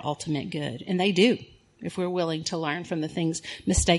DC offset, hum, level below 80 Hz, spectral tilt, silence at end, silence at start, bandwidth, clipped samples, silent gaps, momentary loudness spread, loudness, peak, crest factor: under 0.1%; none; -42 dBFS; -4.5 dB/octave; 0 s; 0 s; 11.5 kHz; under 0.1%; none; 10 LU; -27 LUFS; -8 dBFS; 20 dB